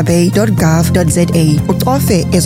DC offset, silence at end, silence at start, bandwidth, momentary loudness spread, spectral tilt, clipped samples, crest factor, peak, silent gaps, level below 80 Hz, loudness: under 0.1%; 0 s; 0 s; 16.5 kHz; 2 LU; -6 dB/octave; under 0.1%; 10 dB; 0 dBFS; none; -30 dBFS; -11 LUFS